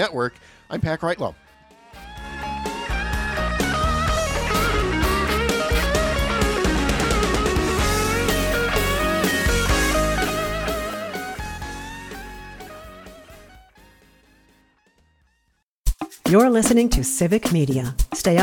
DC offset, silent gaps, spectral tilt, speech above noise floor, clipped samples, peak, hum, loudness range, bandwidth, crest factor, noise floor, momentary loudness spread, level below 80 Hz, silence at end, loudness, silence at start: under 0.1%; 15.63-15.84 s; -4.5 dB/octave; 49 dB; under 0.1%; -4 dBFS; none; 14 LU; 19 kHz; 18 dB; -69 dBFS; 15 LU; -30 dBFS; 0 s; -21 LUFS; 0 s